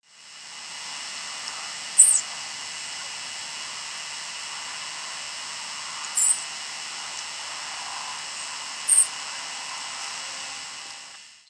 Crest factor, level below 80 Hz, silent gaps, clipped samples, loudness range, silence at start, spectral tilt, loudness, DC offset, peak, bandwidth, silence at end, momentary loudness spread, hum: 28 dB; -80 dBFS; none; under 0.1%; 9 LU; 0.1 s; 3 dB/octave; -25 LUFS; under 0.1%; -2 dBFS; 11 kHz; 0.1 s; 16 LU; none